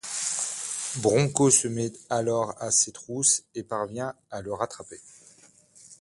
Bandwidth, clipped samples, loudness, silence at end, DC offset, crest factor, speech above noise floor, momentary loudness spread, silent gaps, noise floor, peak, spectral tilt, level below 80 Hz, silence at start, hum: 11.5 kHz; under 0.1%; -25 LUFS; 0.05 s; under 0.1%; 22 dB; 30 dB; 14 LU; none; -56 dBFS; -4 dBFS; -3.5 dB/octave; -64 dBFS; 0.05 s; none